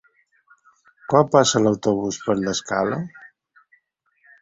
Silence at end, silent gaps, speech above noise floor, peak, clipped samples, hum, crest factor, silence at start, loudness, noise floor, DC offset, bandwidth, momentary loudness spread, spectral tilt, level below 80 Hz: 1.15 s; none; 47 dB; -2 dBFS; under 0.1%; none; 22 dB; 1.1 s; -20 LUFS; -66 dBFS; under 0.1%; 7.8 kHz; 12 LU; -4.5 dB/octave; -58 dBFS